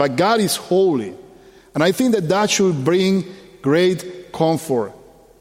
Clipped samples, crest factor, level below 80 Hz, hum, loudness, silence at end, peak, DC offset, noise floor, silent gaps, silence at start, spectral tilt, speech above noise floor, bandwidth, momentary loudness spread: under 0.1%; 16 dB; -58 dBFS; none; -18 LUFS; 0.5 s; -2 dBFS; under 0.1%; -46 dBFS; none; 0 s; -5 dB/octave; 29 dB; 16.5 kHz; 12 LU